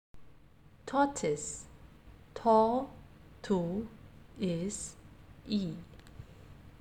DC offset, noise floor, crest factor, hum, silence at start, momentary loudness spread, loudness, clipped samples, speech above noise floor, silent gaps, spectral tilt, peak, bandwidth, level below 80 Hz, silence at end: under 0.1%; -59 dBFS; 20 dB; none; 0.15 s; 26 LU; -33 LUFS; under 0.1%; 28 dB; none; -5.5 dB/octave; -14 dBFS; 14.5 kHz; -58 dBFS; 0.05 s